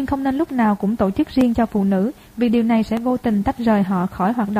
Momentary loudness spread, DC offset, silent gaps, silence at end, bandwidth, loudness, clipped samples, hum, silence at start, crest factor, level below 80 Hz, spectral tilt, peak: 4 LU; under 0.1%; none; 0 s; 15.5 kHz; -19 LUFS; under 0.1%; none; 0 s; 12 dB; -42 dBFS; -8 dB/octave; -6 dBFS